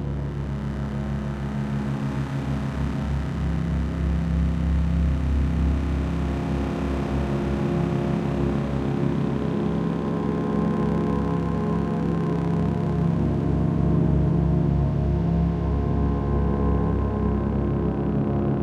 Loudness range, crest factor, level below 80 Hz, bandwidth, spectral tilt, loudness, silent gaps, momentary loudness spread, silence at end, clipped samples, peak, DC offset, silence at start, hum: 4 LU; 14 dB; -30 dBFS; 8.4 kHz; -9 dB/octave; -24 LUFS; none; 5 LU; 0 s; under 0.1%; -10 dBFS; under 0.1%; 0 s; none